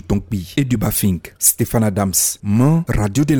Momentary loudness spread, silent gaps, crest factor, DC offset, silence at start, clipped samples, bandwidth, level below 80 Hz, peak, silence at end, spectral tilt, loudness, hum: 6 LU; none; 16 dB; under 0.1%; 0.1 s; under 0.1%; over 20 kHz; -34 dBFS; 0 dBFS; 0 s; -5 dB/octave; -17 LUFS; none